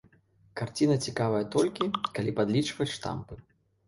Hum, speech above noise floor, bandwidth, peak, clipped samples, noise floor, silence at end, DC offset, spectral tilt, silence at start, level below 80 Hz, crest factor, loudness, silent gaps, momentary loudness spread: none; 34 dB; 11.5 kHz; -14 dBFS; under 0.1%; -63 dBFS; 0.45 s; under 0.1%; -5.5 dB/octave; 0.55 s; -60 dBFS; 16 dB; -29 LUFS; none; 13 LU